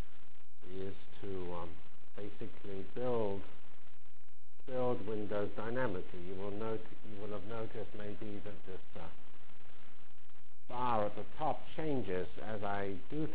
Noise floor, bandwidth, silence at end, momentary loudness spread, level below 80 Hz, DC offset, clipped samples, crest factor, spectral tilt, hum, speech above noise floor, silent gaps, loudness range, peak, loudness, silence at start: -68 dBFS; 4 kHz; 0 s; 20 LU; -62 dBFS; 4%; under 0.1%; 22 dB; -9.5 dB/octave; none; 28 dB; none; 8 LU; -20 dBFS; -41 LUFS; 0 s